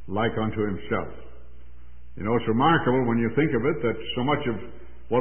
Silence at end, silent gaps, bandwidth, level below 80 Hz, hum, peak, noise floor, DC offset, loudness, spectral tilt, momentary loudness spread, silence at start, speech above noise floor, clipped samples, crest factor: 0 s; none; 3.4 kHz; -48 dBFS; none; -8 dBFS; -48 dBFS; 2%; -25 LUFS; -11 dB/octave; 11 LU; 0 s; 24 dB; under 0.1%; 16 dB